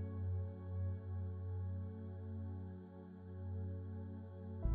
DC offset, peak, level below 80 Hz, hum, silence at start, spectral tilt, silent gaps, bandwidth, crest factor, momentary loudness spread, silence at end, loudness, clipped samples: under 0.1%; -26 dBFS; -54 dBFS; none; 0 s; -11.5 dB/octave; none; 2.4 kHz; 18 dB; 8 LU; 0 s; -46 LUFS; under 0.1%